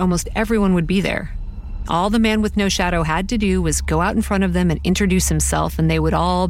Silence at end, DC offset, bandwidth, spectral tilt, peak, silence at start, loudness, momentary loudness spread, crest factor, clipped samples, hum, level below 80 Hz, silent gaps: 0 s; under 0.1%; 16.5 kHz; -5 dB/octave; -4 dBFS; 0 s; -18 LUFS; 6 LU; 14 dB; under 0.1%; none; -26 dBFS; none